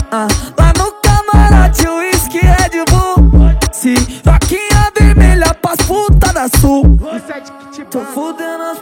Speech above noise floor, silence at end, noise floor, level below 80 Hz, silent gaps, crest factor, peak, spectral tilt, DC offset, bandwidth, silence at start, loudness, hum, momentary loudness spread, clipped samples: 13 dB; 0 s; -30 dBFS; -12 dBFS; none; 10 dB; 0 dBFS; -5 dB/octave; under 0.1%; 17 kHz; 0 s; -11 LUFS; none; 13 LU; 0.1%